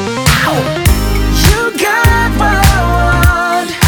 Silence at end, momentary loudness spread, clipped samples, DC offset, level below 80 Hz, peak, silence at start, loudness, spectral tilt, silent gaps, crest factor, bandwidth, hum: 0 s; 3 LU; 0.4%; under 0.1%; -16 dBFS; 0 dBFS; 0 s; -11 LUFS; -4.5 dB/octave; none; 10 dB; over 20 kHz; none